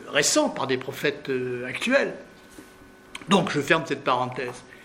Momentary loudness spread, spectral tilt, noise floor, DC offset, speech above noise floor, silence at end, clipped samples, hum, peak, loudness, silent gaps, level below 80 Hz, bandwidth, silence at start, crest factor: 12 LU; -3.5 dB/octave; -49 dBFS; under 0.1%; 25 dB; 0 s; under 0.1%; none; -2 dBFS; -24 LUFS; none; -62 dBFS; 16 kHz; 0 s; 24 dB